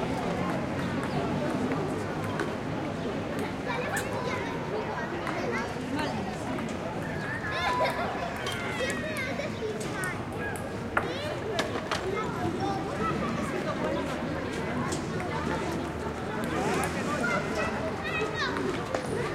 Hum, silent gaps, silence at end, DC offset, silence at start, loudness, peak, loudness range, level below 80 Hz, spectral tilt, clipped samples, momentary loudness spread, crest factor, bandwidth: none; none; 0 s; under 0.1%; 0 s; -31 LUFS; -8 dBFS; 2 LU; -50 dBFS; -5 dB/octave; under 0.1%; 4 LU; 22 dB; 16.5 kHz